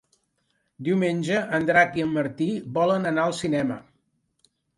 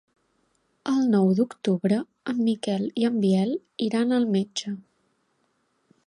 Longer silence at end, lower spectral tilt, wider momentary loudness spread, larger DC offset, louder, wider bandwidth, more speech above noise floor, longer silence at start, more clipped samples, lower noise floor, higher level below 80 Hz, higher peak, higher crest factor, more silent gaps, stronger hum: second, 0.95 s vs 1.3 s; about the same, -6 dB/octave vs -6.5 dB/octave; about the same, 8 LU vs 10 LU; neither; about the same, -24 LUFS vs -24 LUFS; about the same, 11.5 kHz vs 11 kHz; about the same, 49 dB vs 47 dB; about the same, 0.8 s vs 0.85 s; neither; about the same, -72 dBFS vs -71 dBFS; first, -64 dBFS vs -72 dBFS; first, -4 dBFS vs -10 dBFS; first, 20 dB vs 14 dB; neither; neither